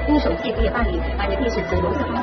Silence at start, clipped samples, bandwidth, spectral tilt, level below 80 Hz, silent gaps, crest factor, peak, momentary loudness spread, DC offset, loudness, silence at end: 0 s; under 0.1%; 6.4 kHz; -5.5 dB/octave; -26 dBFS; none; 14 dB; -6 dBFS; 4 LU; under 0.1%; -22 LUFS; 0 s